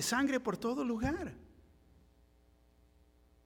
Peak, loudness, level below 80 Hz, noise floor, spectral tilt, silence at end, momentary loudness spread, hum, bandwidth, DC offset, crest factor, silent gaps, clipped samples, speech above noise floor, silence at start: -20 dBFS; -35 LUFS; -58 dBFS; -67 dBFS; -4 dB/octave; 2 s; 13 LU; none; 17.5 kHz; under 0.1%; 18 dB; none; under 0.1%; 32 dB; 0 s